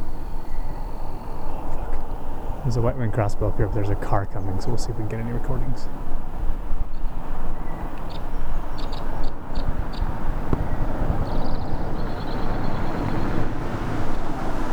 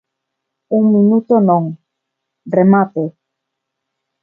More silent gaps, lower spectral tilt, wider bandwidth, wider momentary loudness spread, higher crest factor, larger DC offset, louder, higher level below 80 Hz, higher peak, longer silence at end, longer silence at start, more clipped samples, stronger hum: neither; second, -7.5 dB/octave vs -13 dB/octave; first, 5.6 kHz vs 2.3 kHz; about the same, 10 LU vs 11 LU; about the same, 14 dB vs 16 dB; neither; second, -29 LUFS vs -13 LUFS; first, -24 dBFS vs -64 dBFS; second, -6 dBFS vs 0 dBFS; second, 0 s vs 1.15 s; second, 0 s vs 0.7 s; neither; neither